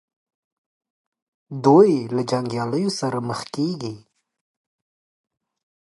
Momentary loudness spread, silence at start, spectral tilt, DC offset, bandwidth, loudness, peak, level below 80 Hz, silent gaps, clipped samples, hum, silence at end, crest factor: 15 LU; 1.5 s; -6.5 dB/octave; under 0.1%; 11.5 kHz; -20 LUFS; -2 dBFS; -68 dBFS; none; under 0.1%; none; 1.85 s; 22 dB